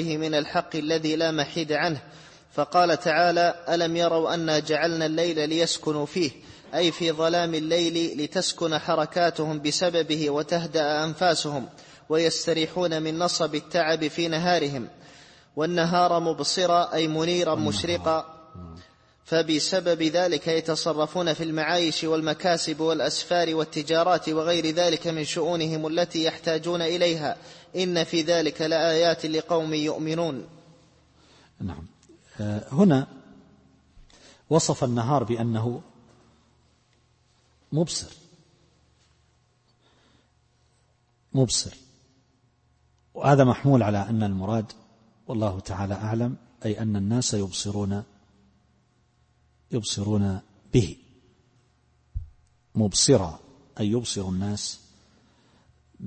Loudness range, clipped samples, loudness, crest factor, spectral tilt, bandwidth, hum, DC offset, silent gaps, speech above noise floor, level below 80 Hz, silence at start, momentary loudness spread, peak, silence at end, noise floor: 7 LU; under 0.1%; -25 LUFS; 20 dB; -4.5 dB/octave; 8.8 kHz; none; under 0.1%; none; 41 dB; -54 dBFS; 0 s; 11 LU; -6 dBFS; 0 s; -66 dBFS